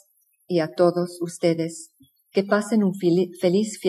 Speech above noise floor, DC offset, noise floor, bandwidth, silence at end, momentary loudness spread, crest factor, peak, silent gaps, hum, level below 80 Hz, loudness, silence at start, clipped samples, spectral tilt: 40 dB; under 0.1%; -62 dBFS; 14 kHz; 0 s; 7 LU; 18 dB; -4 dBFS; none; none; -78 dBFS; -23 LUFS; 0.5 s; under 0.1%; -6 dB/octave